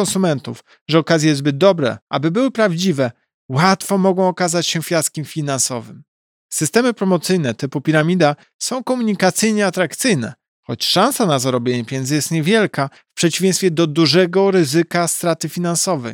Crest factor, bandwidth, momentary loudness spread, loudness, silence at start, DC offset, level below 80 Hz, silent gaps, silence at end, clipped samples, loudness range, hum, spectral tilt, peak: 16 dB; 18.5 kHz; 8 LU; -17 LUFS; 0 s; under 0.1%; -66 dBFS; 0.81-0.86 s, 2.02-2.07 s, 3.34-3.49 s, 6.08-6.49 s, 8.54-8.59 s, 10.48-10.63 s; 0 s; under 0.1%; 3 LU; none; -4.5 dB/octave; -2 dBFS